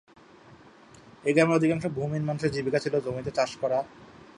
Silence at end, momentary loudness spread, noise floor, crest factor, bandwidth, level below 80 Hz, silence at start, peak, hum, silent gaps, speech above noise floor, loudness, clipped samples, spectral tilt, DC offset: 0.1 s; 8 LU; -52 dBFS; 20 dB; 11 kHz; -60 dBFS; 0.5 s; -8 dBFS; none; none; 26 dB; -27 LUFS; under 0.1%; -6.5 dB/octave; under 0.1%